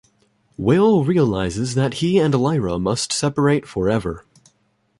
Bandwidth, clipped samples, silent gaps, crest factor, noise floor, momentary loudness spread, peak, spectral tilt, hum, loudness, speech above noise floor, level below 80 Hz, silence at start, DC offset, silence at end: 11.5 kHz; under 0.1%; none; 14 dB; -65 dBFS; 7 LU; -4 dBFS; -6 dB/octave; none; -19 LUFS; 46 dB; -44 dBFS; 0.6 s; under 0.1%; 0.8 s